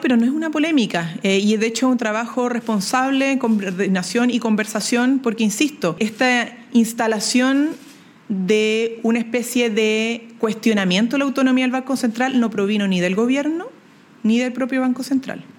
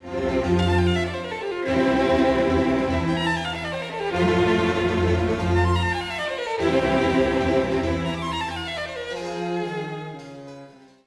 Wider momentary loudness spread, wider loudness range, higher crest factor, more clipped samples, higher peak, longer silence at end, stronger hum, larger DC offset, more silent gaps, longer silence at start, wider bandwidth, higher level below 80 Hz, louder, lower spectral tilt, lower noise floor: second, 5 LU vs 10 LU; second, 1 LU vs 4 LU; about the same, 16 dB vs 14 dB; neither; first, -4 dBFS vs -8 dBFS; second, 0.15 s vs 0.35 s; neither; neither; neither; about the same, 0 s vs 0 s; first, 17.5 kHz vs 11 kHz; second, -70 dBFS vs -40 dBFS; first, -19 LUFS vs -23 LUFS; second, -4.5 dB/octave vs -6.5 dB/octave; about the same, -47 dBFS vs -45 dBFS